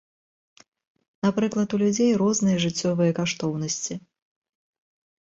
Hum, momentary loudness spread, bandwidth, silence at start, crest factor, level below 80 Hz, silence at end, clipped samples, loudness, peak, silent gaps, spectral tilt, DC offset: none; 7 LU; 8 kHz; 1.25 s; 16 dB; -62 dBFS; 1.2 s; under 0.1%; -24 LUFS; -10 dBFS; none; -5 dB/octave; under 0.1%